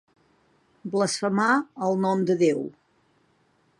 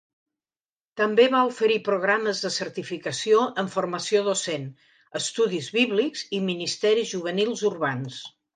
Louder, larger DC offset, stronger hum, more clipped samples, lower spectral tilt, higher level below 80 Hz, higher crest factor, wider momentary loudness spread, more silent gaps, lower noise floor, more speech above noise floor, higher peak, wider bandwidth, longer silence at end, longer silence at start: about the same, -24 LUFS vs -24 LUFS; neither; neither; neither; first, -5 dB/octave vs -3.5 dB/octave; about the same, -74 dBFS vs -76 dBFS; about the same, 18 dB vs 18 dB; about the same, 9 LU vs 11 LU; neither; second, -65 dBFS vs under -90 dBFS; second, 42 dB vs over 66 dB; second, -10 dBFS vs -6 dBFS; first, 11.5 kHz vs 9.6 kHz; first, 1.1 s vs 0.25 s; about the same, 0.85 s vs 0.95 s